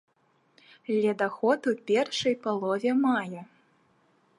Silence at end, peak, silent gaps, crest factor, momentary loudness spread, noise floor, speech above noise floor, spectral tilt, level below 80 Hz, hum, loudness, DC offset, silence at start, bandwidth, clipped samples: 0.95 s; -12 dBFS; none; 18 dB; 7 LU; -68 dBFS; 42 dB; -5 dB/octave; -76 dBFS; none; -27 LUFS; under 0.1%; 0.9 s; 11.5 kHz; under 0.1%